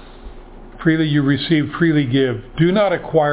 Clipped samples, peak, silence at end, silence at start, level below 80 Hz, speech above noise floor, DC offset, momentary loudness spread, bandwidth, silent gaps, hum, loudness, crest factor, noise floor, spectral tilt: under 0.1%; -2 dBFS; 0 s; 0 s; -42 dBFS; 21 dB; under 0.1%; 3 LU; 4 kHz; none; none; -17 LUFS; 16 dB; -37 dBFS; -11 dB/octave